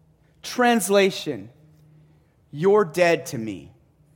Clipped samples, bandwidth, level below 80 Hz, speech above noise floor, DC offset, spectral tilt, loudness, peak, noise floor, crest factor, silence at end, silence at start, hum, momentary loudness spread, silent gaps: under 0.1%; 17 kHz; -64 dBFS; 37 dB; under 0.1%; -4.5 dB/octave; -21 LUFS; -6 dBFS; -57 dBFS; 18 dB; 0.5 s; 0.45 s; none; 19 LU; none